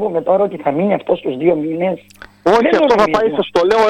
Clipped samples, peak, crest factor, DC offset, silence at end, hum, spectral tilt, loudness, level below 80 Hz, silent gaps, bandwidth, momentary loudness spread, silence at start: under 0.1%; 0 dBFS; 14 dB; under 0.1%; 0 s; none; -6 dB/octave; -15 LUFS; -48 dBFS; none; 11.5 kHz; 8 LU; 0 s